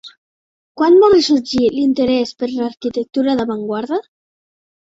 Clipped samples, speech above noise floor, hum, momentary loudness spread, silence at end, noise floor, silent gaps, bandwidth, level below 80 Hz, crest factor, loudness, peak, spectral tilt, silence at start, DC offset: under 0.1%; over 75 dB; none; 12 LU; 0.9 s; under -90 dBFS; 0.17-0.75 s; 7.8 kHz; -52 dBFS; 14 dB; -16 LUFS; -2 dBFS; -5 dB/octave; 0.05 s; under 0.1%